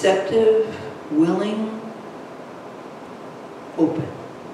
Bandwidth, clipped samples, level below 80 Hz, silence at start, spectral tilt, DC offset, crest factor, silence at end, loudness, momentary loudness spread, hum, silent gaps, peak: 11.5 kHz; under 0.1%; -68 dBFS; 0 s; -6 dB/octave; under 0.1%; 18 dB; 0 s; -21 LUFS; 19 LU; none; none; -6 dBFS